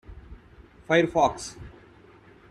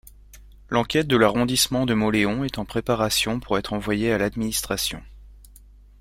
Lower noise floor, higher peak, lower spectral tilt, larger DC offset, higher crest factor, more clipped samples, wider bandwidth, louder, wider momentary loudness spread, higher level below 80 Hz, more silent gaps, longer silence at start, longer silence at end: first, -53 dBFS vs -48 dBFS; about the same, -6 dBFS vs -4 dBFS; about the same, -5 dB/octave vs -4 dB/octave; neither; about the same, 22 dB vs 20 dB; neither; second, 12 kHz vs 16.5 kHz; about the same, -24 LUFS vs -22 LUFS; first, 26 LU vs 8 LU; second, -50 dBFS vs -44 dBFS; neither; about the same, 0.1 s vs 0.05 s; first, 0.85 s vs 0.55 s